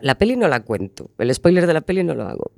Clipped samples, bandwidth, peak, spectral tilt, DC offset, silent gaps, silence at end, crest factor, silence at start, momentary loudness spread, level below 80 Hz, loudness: under 0.1%; 13.5 kHz; 0 dBFS; -6 dB/octave; under 0.1%; none; 0.1 s; 18 dB; 0 s; 11 LU; -44 dBFS; -19 LUFS